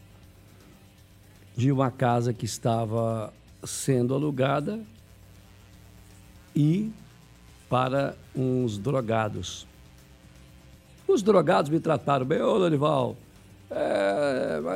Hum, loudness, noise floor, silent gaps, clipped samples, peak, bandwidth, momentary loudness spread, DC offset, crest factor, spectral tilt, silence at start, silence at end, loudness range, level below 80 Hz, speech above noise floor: none; -26 LUFS; -53 dBFS; none; under 0.1%; -8 dBFS; 16 kHz; 13 LU; under 0.1%; 20 dB; -6.5 dB/octave; 1.55 s; 0 s; 6 LU; -58 dBFS; 28 dB